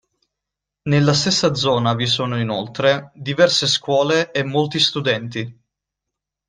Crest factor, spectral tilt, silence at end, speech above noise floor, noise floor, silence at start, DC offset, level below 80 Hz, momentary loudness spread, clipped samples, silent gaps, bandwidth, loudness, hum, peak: 18 dB; -4.5 dB/octave; 0.95 s; 65 dB; -83 dBFS; 0.85 s; under 0.1%; -56 dBFS; 8 LU; under 0.1%; none; 10 kHz; -18 LUFS; none; -2 dBFS